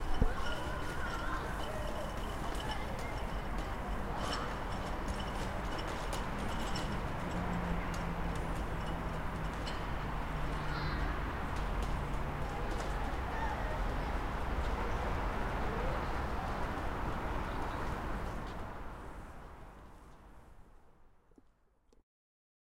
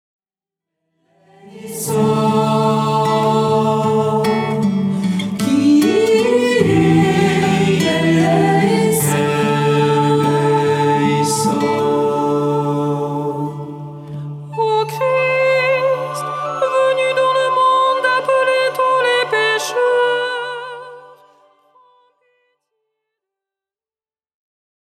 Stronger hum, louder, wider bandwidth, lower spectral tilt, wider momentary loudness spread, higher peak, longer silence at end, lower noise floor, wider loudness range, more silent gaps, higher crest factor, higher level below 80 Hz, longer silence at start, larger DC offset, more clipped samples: neither; second, -39 LUFS vs -15 LUFS; about the same, 16 kHz vs 16.5 kHz; about the same, -5.5 dB/octave vs -5.5 dB/octave; second, 5 LU vs 9 LU; second, -16 dBFS vs -2 dBFS; second, 1.65 s vs 3.85 s; second, -68 dBFS vs under -90 dBFS; about the same, 6 LU vs 5 LU; neither; about the same, 20 dB vs 16 dB; first, -40 dBFS vs -54 dBFS; second, 0 s vs 1.45 s; neither; neither